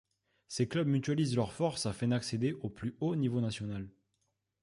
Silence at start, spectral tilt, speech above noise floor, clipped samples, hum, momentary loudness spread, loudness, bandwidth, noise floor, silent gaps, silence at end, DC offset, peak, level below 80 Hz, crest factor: 0.5 s; -6 dB/octave; 48 dB; under 0.1%; none; 9 LU; -34 LUFS; 11.5 kHz; -81 dBFS; none; 0.75 s; under 0.1%; -18 dBFS; -62 dBFS; 16 dB